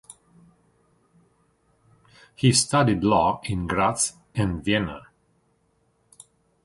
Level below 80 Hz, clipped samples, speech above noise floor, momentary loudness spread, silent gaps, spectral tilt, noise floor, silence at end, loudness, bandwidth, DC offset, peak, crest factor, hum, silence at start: -48 dBFS; under 0.1%; 45 dB; 9 LU; none; -4.5 dB/octave; -67 dBFS; 1.65 s; -23 LUFS; 11.5 kHz; under 0.1%; -4 dBFS; 22 dB; none; 2.4 s